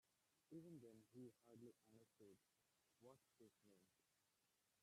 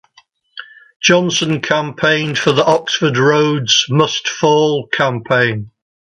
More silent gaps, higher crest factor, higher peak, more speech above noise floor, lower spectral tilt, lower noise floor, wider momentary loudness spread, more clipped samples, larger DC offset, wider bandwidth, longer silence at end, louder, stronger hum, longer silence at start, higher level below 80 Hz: second, none vs 0.96-1.00 s; about the same, 18 dB vs 16 dB; second, -50 dBFS vs 0 dBFS; second, 18 dB vs 38 dB; first, -6.5 dB/octave vs -4 dB/octave; first, -88 dBFS vs -53 dBFS; about the same, 5 LU vs 5 LU; neither; neither; first, 13 kHz vs 11 kHz; second, 0 s vs 0.35 s; second, -65 LUFS vs -14 LUFS; neither; second, 0.05 s vs 0.55 s; second, under -90 dBFS vs -56 dBFS